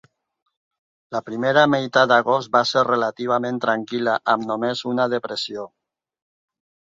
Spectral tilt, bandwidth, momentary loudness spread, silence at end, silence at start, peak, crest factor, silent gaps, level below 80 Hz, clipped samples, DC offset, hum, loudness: -5 dB/octave; 7.8 kHz; 12 LU; 1.2 s; 1.1 s; -2 dBFS; 20 dB; none; -68 dBFS; under 0.1%; under 0.1%; none; -20 LUFS